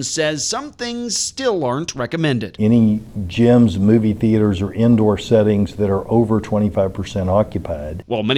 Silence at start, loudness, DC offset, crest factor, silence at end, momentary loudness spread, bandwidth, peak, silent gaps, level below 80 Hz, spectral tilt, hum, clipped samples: 0 s; -17 LUFS; under 0.1%; 14 dB; 0 s; 9 LU; 12 kHz; -2 dBFS; none; -42 dBFS; -5.5 dB/octave; none; under 0.1%